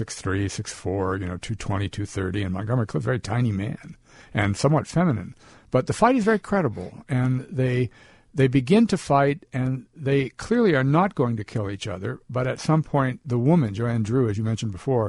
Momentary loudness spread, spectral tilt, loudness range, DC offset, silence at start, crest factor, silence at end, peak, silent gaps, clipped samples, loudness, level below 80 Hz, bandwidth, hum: 10 LU; -7 dB/octave; 5 LU; under 0.1%; 0 s; 18 dB; 0 s; -4 dBFS; none; under 0.1%; -24 LUFS; -50 dBFS; 11.5 kHz; none